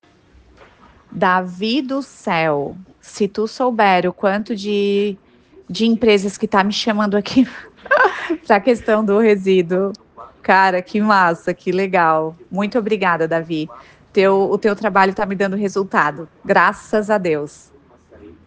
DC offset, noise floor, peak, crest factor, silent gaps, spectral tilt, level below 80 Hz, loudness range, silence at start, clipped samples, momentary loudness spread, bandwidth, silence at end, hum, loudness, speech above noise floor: under 0.1%; -50 dBFS; 0 dBFS; 18 dB; none; -5.5 dB/octave; -56 dBFS; 3 LU; 1.1 s; under 0.1%; 10 LU; 9.4 kHz; 0.15 s; none; -17 LUFS; 33 dB